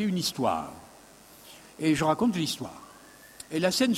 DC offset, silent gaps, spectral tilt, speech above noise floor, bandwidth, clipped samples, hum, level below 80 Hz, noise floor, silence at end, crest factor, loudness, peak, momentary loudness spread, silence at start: under 0.1%; none; -4.5 dB/octave; 26 dB; 16 kHz; under 0.1%; none; -60 dBFS; -52 dBFS; 0 s; 18 dB; -28 LUFS; -10 dBFS; 24 LU; 0 s